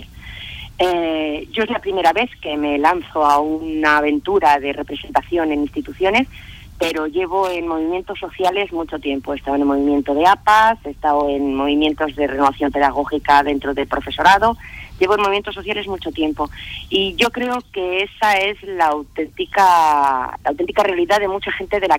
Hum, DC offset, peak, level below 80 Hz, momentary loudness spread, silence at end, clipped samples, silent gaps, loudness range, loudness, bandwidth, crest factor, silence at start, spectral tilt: none; under 0.1%; -2 dBFS; -42 dBFS; 10 LU; 0 s; under 0.1%; none; 4 LU; -18 LUFS; 16.5 kHz; 14 dB; 0 s; -4.5 dB/octave